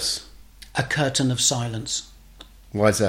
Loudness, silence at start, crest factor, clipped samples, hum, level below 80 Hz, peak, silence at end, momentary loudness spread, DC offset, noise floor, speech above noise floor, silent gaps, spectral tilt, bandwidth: -23 LUFS; 0 s; 20 dB; under 0.1%; none; -48 dBFS; -4 dBFS; 0 s; 10 LU; under 0.1%; -47 dBFS; 25 dB; none; -3.5 dB/octave; 16.5 kHz